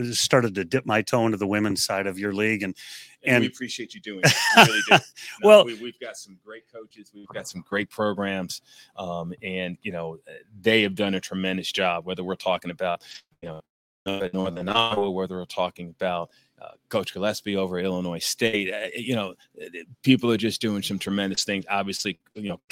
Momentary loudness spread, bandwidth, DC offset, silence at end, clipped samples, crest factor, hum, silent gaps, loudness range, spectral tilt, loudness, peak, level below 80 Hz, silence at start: 19 LU; 16.5 kHz; under 0.1%; 0.15 s; under 0.1%; 24 dB; none; 13.69-14.06 s; 11 LU; -4 dB/octave; -23 LUFS; 0 dBFS; -64 dBFS; 0 s